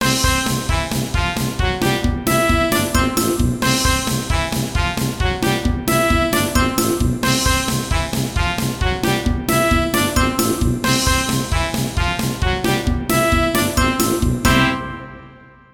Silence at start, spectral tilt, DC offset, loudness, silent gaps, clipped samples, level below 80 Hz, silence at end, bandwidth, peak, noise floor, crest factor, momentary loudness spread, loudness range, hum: 0 s; -4 dB/octave; under 0.1%; -18 LUFS; none; under 0.1%; -26 dBFS; 0.3 s; 18 kHz; -2 dBFS; -43 dBFS; 16 dB; 5 LU; 1 LU; none